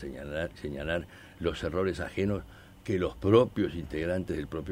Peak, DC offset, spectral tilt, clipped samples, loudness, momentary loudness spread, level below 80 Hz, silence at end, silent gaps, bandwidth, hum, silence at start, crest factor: -8 dBFS; under 0.1%; -7 dB/octave; under 0.1%; -31 LUFS; 13 LU; -48 dBFS; 0 s; none; 16 kHz; none; 0 s; 22 dB